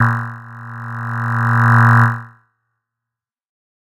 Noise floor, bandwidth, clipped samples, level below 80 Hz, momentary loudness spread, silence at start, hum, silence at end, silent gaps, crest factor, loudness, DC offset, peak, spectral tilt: -85 dBFS; 6.8 kHz; under 0.1%; -62 dBFS; 20 LU; 0 s; none; 1.55 s; none; 16 dB; -14 LUFS; under 0.1%; 0 dBFS; -8 dB/octave